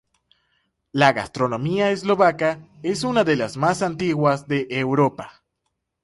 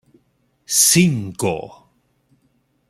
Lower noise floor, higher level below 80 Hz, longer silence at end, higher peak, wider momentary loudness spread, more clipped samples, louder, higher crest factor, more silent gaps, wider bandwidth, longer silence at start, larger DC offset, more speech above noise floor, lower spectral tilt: first, -77 dBFS vs -64 dBFS; about the same, -58 dBFS vs -56 dBFS; second, 0.75 s vs 1.2 s; about the same, -2 dBFS vs -2 dBFS; second, 8 LU vs 16 LU; neither; second, -21 LUFS vs -16 LUFS; about the same, 18 dB vs 20 dB; neither; second, 11.5 kHz vs 15 kHz; first, 0.95 s vs 0.7 s; neither; first, 56 dB vs 47 dB; first, -6 dB/octave vs -3.5 dB/octave